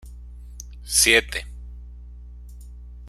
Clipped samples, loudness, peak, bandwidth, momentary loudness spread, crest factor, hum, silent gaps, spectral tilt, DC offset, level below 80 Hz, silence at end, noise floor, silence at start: under 0.1%; -18 LUFS; -2 dBFS; 16 kHz; 28 LU; 24 dB; 60 Hz at -40 dBFS; none; -1 dB/octave; under 0.1%; -38 dBFS; 0 s; -40 dBFS; 0.05 s